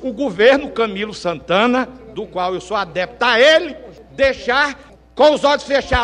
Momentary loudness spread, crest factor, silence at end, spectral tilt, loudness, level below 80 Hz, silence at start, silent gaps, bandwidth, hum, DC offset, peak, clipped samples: 16 LU; 16 dB; 0 s; -4 dB/octave; -16 LUFS; -38 dBFS; 0 s; none; 10.5 kHz; none; under 0.1%; 0 dBFS; under 0.1%